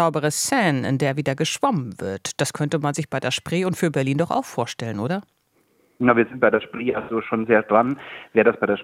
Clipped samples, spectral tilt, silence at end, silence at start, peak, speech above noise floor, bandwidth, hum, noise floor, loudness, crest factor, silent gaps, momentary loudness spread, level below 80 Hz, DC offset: under 0.1%; -5 dB/octave; 0 s; 0 s; -2 dBFS; 42 dB; 16.5 kHz; none; -63 dBFS; -22 LUFS; 20 dB; none; 9 LU; -64 dBFS; under 0.1%